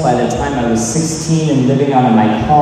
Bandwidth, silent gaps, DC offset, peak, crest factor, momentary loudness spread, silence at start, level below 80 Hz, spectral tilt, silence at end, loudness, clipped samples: 13.5 kHz; none; under 0.1%; 0 dBFS; 12 dB; 5 LU; 0 s; -34 dBFS; -6 dB/octave; 0 s; -13 LUFS; under 0.1%